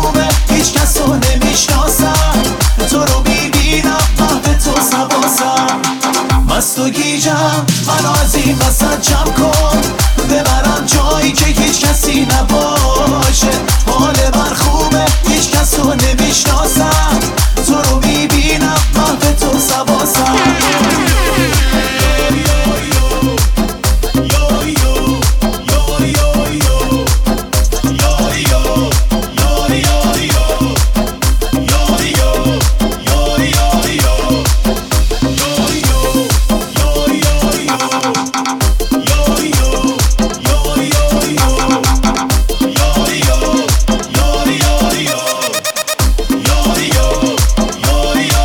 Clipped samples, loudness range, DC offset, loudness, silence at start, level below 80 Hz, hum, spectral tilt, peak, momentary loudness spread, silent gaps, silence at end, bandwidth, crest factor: under 0.1%; 2 LU; under 0.1%; -12 LUFS; 0 s; -16 dBFS; none; -4 dB/octave; 0 dBFS; 3 LU; none; 0 s; 20 kHz; 10 dB